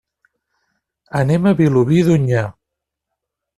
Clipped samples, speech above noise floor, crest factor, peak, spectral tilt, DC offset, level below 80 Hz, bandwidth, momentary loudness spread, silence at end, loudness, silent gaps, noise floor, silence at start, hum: under 0.1%; 67 dB; 14 dB; -2 dBFS; -8 dB/octave; under 0.1%; -50 dBFS; 12.5 kHz; 9 LU; 1.05 s; -15 LUFS; none; -81 dBFS; 1.15 s; none